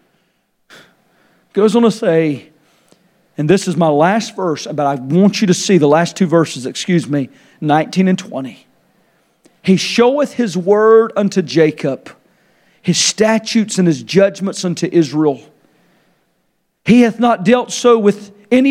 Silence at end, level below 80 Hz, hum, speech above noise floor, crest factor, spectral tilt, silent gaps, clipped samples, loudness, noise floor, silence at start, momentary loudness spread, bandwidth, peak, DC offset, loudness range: 0 s; -62 dBFS; none; 51 dB; 14 dB; -5.5 dB/octave; none; under 0.1%; -14 LUFS; -64 dBFS; 1.55 s; 11 LU; 13.5 kHz; 0 dBFS; under 0.1%; 3 LU